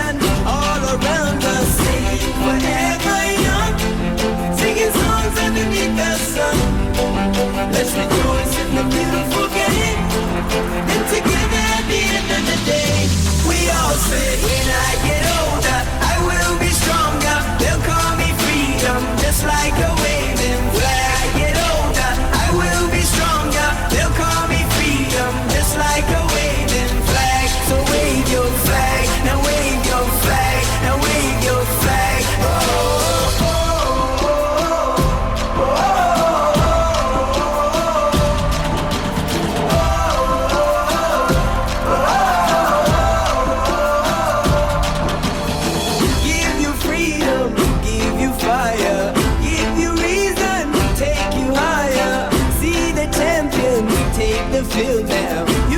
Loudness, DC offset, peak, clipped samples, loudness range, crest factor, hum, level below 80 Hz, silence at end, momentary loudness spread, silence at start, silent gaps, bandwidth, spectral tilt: -17 LUFS; under 0.1%; -4 dBFS; under 0.1%; 1 LU; 12 dB; none; -24 dBFS; 0 s; 3 LU; 0 s; none; over 20 kHz; -4 dB/octave